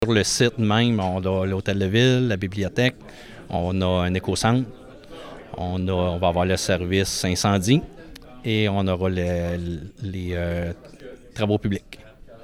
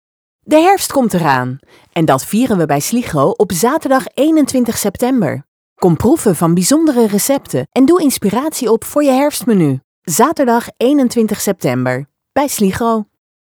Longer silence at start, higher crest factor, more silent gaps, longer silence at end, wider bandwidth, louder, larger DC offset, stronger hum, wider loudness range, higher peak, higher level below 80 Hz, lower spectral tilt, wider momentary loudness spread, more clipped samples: second, 0 s vs 0.45 s; about the same, 18 dB vs 14 dB; second, none vs 5.48-5.76 s, 9.84-10.02 s; second, 0 s vs 0.4 s; second, 15.5 kHz vs over 20 kHz; second, -23 LUFS vs -13 LUFS; neither; neither; about the same, 4 LU vs 2 LU; second, -6 dBFS vs 0 dBFS; about the same, -48 dBFS vs -46 dBFS; about the same, -5 dB/octave vs -5 dB/octave; first, 20 LU vs 7 LU; neither